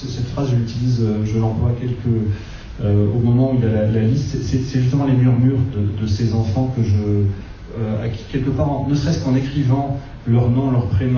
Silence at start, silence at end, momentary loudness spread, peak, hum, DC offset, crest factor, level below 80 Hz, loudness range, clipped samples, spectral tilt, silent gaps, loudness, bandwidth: 0 s; 0 s; 8 LU; -4 dBFS; none; under 0.1%; 12 dB; -34 dBFS; 3 LU; under 0.1%; -8.5 dB/octave; none; -19 LUFS; 7 kHz